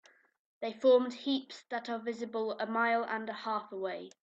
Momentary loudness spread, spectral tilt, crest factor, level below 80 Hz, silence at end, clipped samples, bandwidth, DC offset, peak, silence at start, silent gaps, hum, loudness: 13 LU; -4.5 dB/octave; 18 dB; -86 dBFS; 0.15 s; under 0.1%; 7.8 kHz; under 0.1%; -16 dBFS; 0.6 s; none; none; -33 LUFS